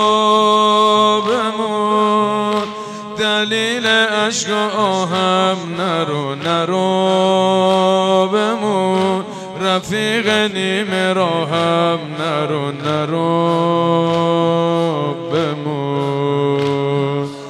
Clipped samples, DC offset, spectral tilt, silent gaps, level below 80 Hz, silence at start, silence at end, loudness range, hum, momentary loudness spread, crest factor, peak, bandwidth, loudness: under 0.1%; under 0.1%; -5 dB/octave; none; -64 dBFS; 0 s; 0 s; 2 LU; none; 7 LU; 14 dB; -2 dBFS; 13 kHz; -16 LUFS